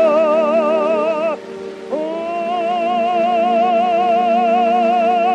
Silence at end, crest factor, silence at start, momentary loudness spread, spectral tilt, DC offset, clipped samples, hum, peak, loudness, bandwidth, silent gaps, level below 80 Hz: 0 s; 12 dB; 0 s; 8 LU; -5.5 dB/octave; under 0.1%; under 0.1%; none; -4 dBFS; -16 LUFS; 8.4 kHz; none; -66 dBFS